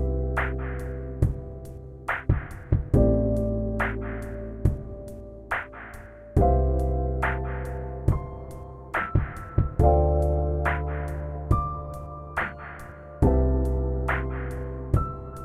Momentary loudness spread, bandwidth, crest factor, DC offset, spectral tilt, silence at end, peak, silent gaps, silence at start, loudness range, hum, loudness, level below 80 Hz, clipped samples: 17 LU; 12 kHz; 18 dB; under 0.1%; -9 dB/octave; 0 s; -8 dBFS; none; 0 s; 3 LU; none; -27 LUFS; -30 dBFS; under 0.1%